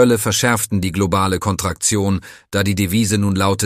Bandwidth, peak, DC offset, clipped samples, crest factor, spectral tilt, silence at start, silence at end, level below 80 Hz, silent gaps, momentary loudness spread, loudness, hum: 15.5 kHz; -2 dBFS; under 0.1%; under 0.1%; 16 dB; -4.5 dB/octave; 0 s; 0 s; -42 dBFS; none; 5 LU; -17 LUFS; none